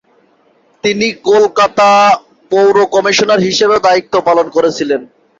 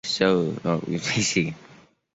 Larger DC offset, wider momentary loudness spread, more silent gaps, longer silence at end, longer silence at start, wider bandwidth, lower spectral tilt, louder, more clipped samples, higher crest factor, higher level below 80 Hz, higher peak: neither; about the same, 8 LU vs 7 LU; neither; about the same, 0.35 s vs 0.4 s; first, 0.85 s vs 0.05 s; about the same, 7.8 kHz vs 8.2 kHz; about the same, -3.5 dB/octave vs -4 dB/octave; first, -11 LUFS vs -24 LUFS; neither; second, 10 dB vs 18 dB; about the same, -54 dBFS vs -56 dBFS; first, 0 dBFS vs -6 dBFS